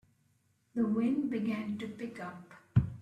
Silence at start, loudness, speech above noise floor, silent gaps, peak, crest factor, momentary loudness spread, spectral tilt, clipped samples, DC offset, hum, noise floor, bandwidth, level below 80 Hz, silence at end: 0.75 s; -34 LUFS; 39 dB; none; -14 dBFS; 20 dB; 13 LU; -9 dB/octave; under 0.1%; under 0.1%; none; -73 dBFS; 9.4 kHz; -54 dBFS; 0 s